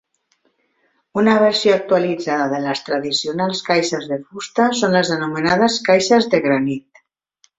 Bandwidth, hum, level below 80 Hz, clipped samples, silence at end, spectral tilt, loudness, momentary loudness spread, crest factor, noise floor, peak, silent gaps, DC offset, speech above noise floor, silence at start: 8.2 kHz; none; -60 dBFS; under 0.1%; 0.8 s; -4.5 dB/octave; -17 LUFS; 10 LU; 16 dB; -65 dBFS; -2 dBFS; none; under 0.1%; 48 dB; 1.15 s